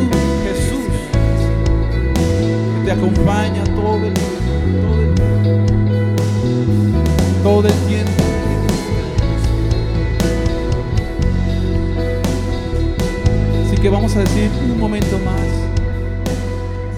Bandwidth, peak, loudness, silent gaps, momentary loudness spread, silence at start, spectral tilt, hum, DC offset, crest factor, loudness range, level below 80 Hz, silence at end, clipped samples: 14.5 kHz; 0 dBFS; -17 LUFS; none; 5 LU; 0 s; -7 dB/octave; none; under 0.1%; 14 dB; 3 LU; -22 dBFS; 0 s; under 0.1%